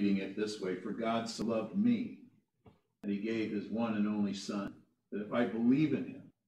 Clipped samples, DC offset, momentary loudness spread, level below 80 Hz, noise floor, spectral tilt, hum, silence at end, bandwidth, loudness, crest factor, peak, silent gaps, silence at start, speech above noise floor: under 0.1%; under 0.1%; 13 LU; -76 dBFS; -65 dBFS; -6.5 dB/octave; none; 0.2 s; 10.5 kHz; -35 LUFS; 16 dB; -18 dBFS; none; 0 s; 32 dB